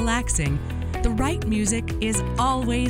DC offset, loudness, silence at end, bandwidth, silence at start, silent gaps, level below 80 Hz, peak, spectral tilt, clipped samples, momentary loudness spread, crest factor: under 0.1%; -24 LUFS; 0 s; 16.5 kHz; 0 s; none; -30 dBFS; -6 dBFS; -4.5 dB/octave; under 0.1%; 4 LU; 16 dB